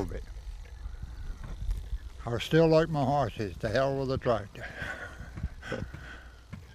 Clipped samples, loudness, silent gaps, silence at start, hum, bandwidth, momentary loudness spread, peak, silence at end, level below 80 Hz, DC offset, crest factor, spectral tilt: under 0.1%; -30 LUFS; none; 0 s; none; 14.5 kHz; 21 LU; -10 dBFS; 0 s; -42 dBFS; under 0.1%; 20 dB; -7 dB/octave